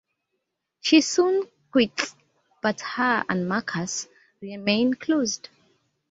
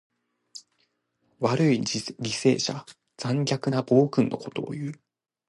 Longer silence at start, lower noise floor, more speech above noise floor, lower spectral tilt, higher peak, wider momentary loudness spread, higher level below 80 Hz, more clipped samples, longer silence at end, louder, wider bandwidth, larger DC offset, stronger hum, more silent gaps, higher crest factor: first, 0.85 s vs 0.55 s; first, -79 dBFS vs -72 dBFS; first, 56 dB vs 47 dB; second, -3.5 dB/octave vs -5.5 dB/octave; first, -4 dBFS vs -8 dBFS; second, 12 LU vs 17 LU; about the same, -68 dBFS vs -68 dBFS; neither; first, 0.75 s vs 0.55 s; about the same, -24 LUFS vs -26 LUFS; second, 8 kHz vs 11.5 kHz; neither; neither; neither; about the same, 22 dB vs 20 dB